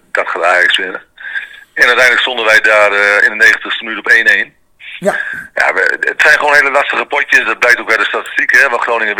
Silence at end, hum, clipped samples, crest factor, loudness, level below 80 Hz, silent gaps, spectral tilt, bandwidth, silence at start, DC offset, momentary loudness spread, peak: 0 s; none; 1%; 12 dB; -9 LUFS; -54 dBFS; none; -1.5 dB/octave; over 20 kHz; 0.15 s; under 0.1%; 13 LU; 0 dBFS